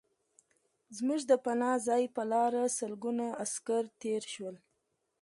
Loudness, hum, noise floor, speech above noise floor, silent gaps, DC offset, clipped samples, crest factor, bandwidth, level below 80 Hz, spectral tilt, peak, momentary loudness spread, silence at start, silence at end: -33 LUFS; none; -81 dBFS; 48 dB; none; under 0.1%; under 0.1%; 20 dB; 11.5 kHz; -84 dBFS; -3.5 dB/octave; -14 dBFS; 9 LU; 0.9 s; 0.65 s